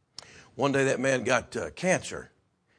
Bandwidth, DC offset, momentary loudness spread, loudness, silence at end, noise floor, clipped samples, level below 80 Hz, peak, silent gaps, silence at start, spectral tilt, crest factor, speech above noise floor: 10.5 kHz; under 0.1%; 21 LU; -27 LUFS; 0.55 s; -50 dBFS; under 0.1%; -62 dBFS; -8 dBFS; none; 0.35 s; -4.5 dB/octave; 20 dB; 23 dB